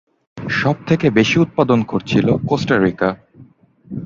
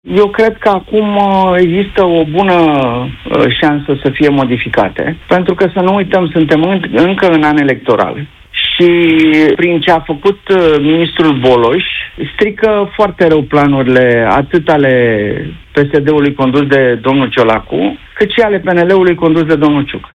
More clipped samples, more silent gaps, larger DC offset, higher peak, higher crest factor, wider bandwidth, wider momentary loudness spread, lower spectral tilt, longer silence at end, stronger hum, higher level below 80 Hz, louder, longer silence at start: second, under 0.1% vs 0.2%; neither; neither; about the same, 0 dBFS vs 0 dBFS; first, 16 dB vs 10 dB; second, 7.6 kHz vs 8.4 kHz; about the same, 8 LU vs 6 LU; about the same, -6.5 dB/octave vs -7.5 dB/octave; about the same, 0 s vs 0.1 s; neither; second, -48 dBFS vs -38 dBFS; second, -16 LUFS vs -10 LUFS; first, 0.35 s vs 0.05 s